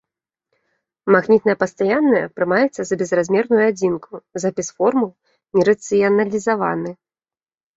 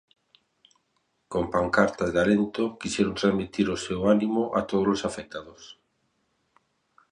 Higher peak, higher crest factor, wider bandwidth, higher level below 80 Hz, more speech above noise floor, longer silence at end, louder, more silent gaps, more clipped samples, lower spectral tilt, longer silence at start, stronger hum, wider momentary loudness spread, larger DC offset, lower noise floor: first, -2 dBFS vs -6 dBFS; about the same, 16 dB vs 20 dB; second, 8 kHz vs 10.5 kHz; second, -62 dBFS vs -54 dBFS; first, over 73 dB vs 48 dB; second, 0.85 s vs 1.4 s; first, -18 LUFS vs -25 LUFS; neither; neither; about the same, -6 dB/octave vs -5.5 dB/octave; second, 1.05 s vs 1.3 s; neither; about the same, 9 LU vs 10 LU; neither; first, under -90 dBFS vs -73 dBFS